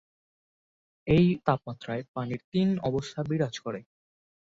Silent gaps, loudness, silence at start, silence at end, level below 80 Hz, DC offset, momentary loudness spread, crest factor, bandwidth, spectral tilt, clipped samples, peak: 2.08-2.14 s, 2.44-2.52 s; -29 LUFS; 1.05 s; 0.6 s; -56 dBFS; under 0.1%; 14 LU; 22 dB; 7.6 kHz; -7.5 dB/octave; under 0.1%; -8 dBFS